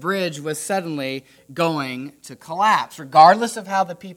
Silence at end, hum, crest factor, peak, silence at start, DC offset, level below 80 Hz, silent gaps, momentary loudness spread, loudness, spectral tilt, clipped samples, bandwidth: 0.05 s; none; 20 dB; 0 dBFS; 0 s; under 0.1%; -70 dBFS; none; 19 LU; -19 LUFS; -4 dB/octave; under 0.1%; 16.5 kHz